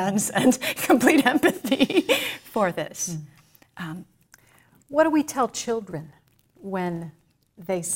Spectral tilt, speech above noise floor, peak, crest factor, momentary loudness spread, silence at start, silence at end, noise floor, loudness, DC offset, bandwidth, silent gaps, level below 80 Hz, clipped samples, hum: -4 dB/octave; 35 dB; -2 dBFS; 22 dB; 19 LU; 0 s; 0 s; -58 dBFS; -23 LUFS; under 0.1%; 16.5 kHz; none; -64 dBFS; under 0.1%; none